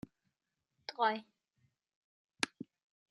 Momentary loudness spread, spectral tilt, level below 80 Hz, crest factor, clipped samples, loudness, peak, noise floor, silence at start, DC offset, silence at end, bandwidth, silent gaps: 20 LU; -2.5 dB/octave; -80 dBFS; 32 dB; under 0.1%; -37 LUFS; -12 dBFS; -88 dBFS; 0.9 s; under 0.1%; 0.65 s; 11.5 kHz; 1.96-2.29 s